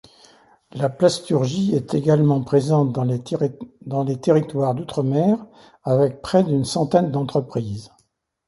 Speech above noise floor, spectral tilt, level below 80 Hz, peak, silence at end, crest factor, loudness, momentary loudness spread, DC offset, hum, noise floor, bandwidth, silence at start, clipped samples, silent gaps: 46 dB; -7.5 dB/octave; -56 dBFS; -2 dBFS; 0.6 s; 18 dB; -20 LUFS; 10 LU; under 0.1%; none; -66 dBFS; 11.5 kHz; 0.75 s; under 0.1%; none